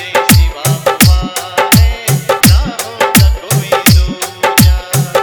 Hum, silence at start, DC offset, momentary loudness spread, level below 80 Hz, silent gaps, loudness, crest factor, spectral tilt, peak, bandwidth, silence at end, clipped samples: none; 0 s; under 0.1%; 6 LU; -16 dBFS; none; -10 LUFS; 10 dB; -4 dB/octave; 0 dBFS; over 20 kHz; 0 s; 0.6%